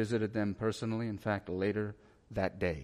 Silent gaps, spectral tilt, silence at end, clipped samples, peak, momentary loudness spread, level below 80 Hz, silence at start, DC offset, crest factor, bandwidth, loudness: none; -7 dB/octave; 0 s; under 0.1%; -18 dBFS; 4 LU; -58 dBFS; 0 s; under 0.1%; 16 dB; 12.5 kHz; -35 LUFS